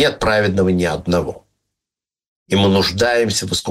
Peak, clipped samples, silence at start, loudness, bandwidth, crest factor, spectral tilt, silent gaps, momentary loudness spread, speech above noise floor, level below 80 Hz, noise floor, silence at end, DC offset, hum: -2 dBFS; under 0.1%; 0 s; -16 LUFS; 16 kHz; 16 dB; -4.5 dB/octave; 2.28-2.46 s; 5 LU; 72 dB; -40 dBFS; -88 dBFS; 0 s; under 0.1%; none